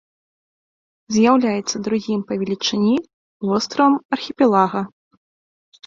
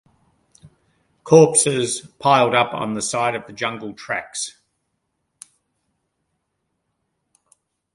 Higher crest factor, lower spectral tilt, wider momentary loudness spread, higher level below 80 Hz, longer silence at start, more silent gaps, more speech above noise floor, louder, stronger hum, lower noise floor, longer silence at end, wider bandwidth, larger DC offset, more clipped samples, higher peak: about the same, 18 dB vs 22 dB; first, -5 dB/octave vs -3.5 dB/octave; second, 9 LU vs 15 LU; about the same, -62 dBFS vs -64 dBFS; second, 1.1 s vs 1.25 s; first, 3.13-3.40 s, 4.05-4.09 s vs none; first, over 72 dB vs 56 dB; about the same, -19 LUFS vs -18 LUFS; neither; first, under -90 dBFS vs -74 dBFS; second, 1 s vs 3.45 s; second, 7.6 kHz vs 11.5 kHz; neither; neither; about the same, -2 dBFS vs 0 dBFS